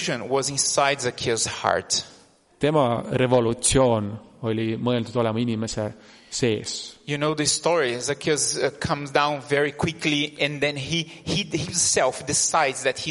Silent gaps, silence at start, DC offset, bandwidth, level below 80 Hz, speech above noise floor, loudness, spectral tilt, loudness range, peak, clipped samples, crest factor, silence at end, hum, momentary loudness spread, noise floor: none; 0 s; under 0.1%; 11.5 kHz; -50 dBFS; 29 dB; -23 LUFS; -3.5 dB/octave; 2 LU; -4 dBFS; under 0.1%; 20 dB; 0 s; none; 7 LU; -52 dBFS